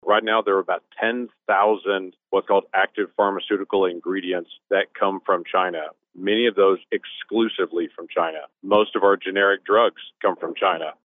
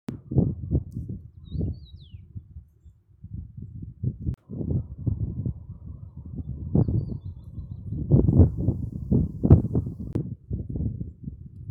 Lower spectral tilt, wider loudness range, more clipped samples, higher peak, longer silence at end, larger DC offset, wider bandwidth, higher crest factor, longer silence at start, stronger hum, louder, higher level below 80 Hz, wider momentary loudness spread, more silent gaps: second, -8 dB/octave vs -12.5 dB/octave; second, 2 LU vs 13 LU; neither; second, -6 dBFS vs -2 dBFS; first, 0.15 s vs 0 s; neither; about the same, 3.9 kHz vs 4.2 kHz; second, 16 dB vs 24 dB; about the same, 0.05 s vs 0.1 s; neither; first, -22 LUFS vs -26 LUFS; second, -70 dBFS vs -36 dBFS; second, 8 LU vs 22 LU; neither